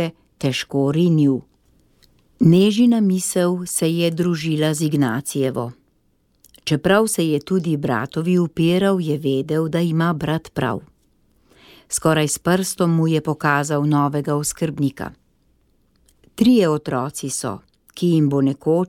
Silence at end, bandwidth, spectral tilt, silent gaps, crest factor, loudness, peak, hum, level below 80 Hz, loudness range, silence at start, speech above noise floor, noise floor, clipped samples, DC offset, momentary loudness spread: 0 s; 16.5 kHz; -5.5 dB/octave; none; 18 dB; -19 LUFS; -2 dBFS; none; -54 dBFS; 4 LU; 0 s; 44 dB; -63 dBFS; under 0.1%; under 0.1%; 9 LU